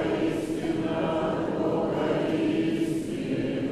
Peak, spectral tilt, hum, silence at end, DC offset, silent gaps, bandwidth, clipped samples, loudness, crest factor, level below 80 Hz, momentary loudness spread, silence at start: -14 dBFS; -7 dB/octave; none; 0 s; under 0.1%; none; 13 kHz; under 0.1%; -27 LUFS; 12 dB; -52 dBFS; 3 LU; 0 s